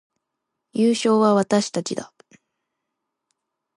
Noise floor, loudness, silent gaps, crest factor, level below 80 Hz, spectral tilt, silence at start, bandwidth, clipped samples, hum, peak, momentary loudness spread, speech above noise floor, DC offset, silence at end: -81 dBFS; -20 LUFS; none; 18 dB; -72 dBFS; -5 dB/octave; 0.75 s; 11.5 kHz; under 0.1%; none; -6 dBFS; 14 LU; 61 dB; under 0.1%; 1.7 s